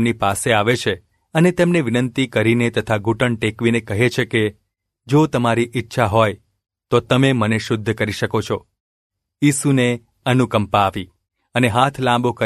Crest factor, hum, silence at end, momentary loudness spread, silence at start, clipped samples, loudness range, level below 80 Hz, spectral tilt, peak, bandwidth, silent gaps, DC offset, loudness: 18 dB; none; 0 s; 7 LU; 0 s; under 0.1%; 2 LU; -50 dBFS; -5.5 dB/octave; 0 dBFS; 14 kHz; 8.80-9.10 s; under 0.1%; -18 LUFS